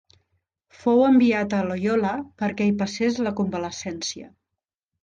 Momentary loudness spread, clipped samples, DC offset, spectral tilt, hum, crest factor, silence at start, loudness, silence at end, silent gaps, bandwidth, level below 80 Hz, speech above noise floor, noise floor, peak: 13 LU; under 0.1%; under 0.1%; -5.5 dB/octave; none; 16 dB; 0.8 s; -23 LUFS; 0.75 s; none; 9 kHz; -58 dBFS; 63 dB; -85 dBFS; -8 dBFS